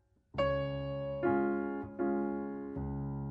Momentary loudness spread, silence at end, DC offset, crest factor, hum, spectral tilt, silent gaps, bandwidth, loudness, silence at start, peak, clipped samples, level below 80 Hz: 8 LU; 0 s; under 0.1%; 16 dB; none; -9.5 dB/octave; none; 5.4 kHz; -36 LUFS; 0.35 s; -18 dBFS; under 0.1%; -52 dBFS